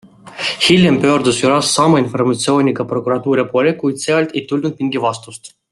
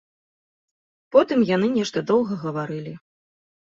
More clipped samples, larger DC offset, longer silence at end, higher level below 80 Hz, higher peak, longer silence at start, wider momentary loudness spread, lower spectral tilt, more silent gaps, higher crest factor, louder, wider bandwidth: neither; neither; second, 0.25 s vs 0.8 s; first, -52 dBFS vs -66 dBFS; first, 0 dBFS vs -4 dBFS; second, 0.25 s vs 1.1 s; second, 9 LU vs 12 LU; second, -4.5 dB/octave vs -6.5 dB/octave; neither; second, 14 dB vs 20 dB; first, -15 LUFS vs -22 LUFS; first, 12.5 kHz vs 7.8 kHz